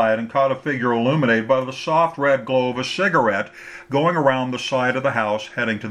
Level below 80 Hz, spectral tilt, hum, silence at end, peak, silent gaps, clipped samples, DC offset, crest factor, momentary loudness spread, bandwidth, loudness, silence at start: -64 dBFS; -5.5 dB/octave; none; 0 s; -2 dBFS; none; under 0.1%; under 0.1%; 18 dB; 6 LU; 11 kHz; -20 LUFS; 0 s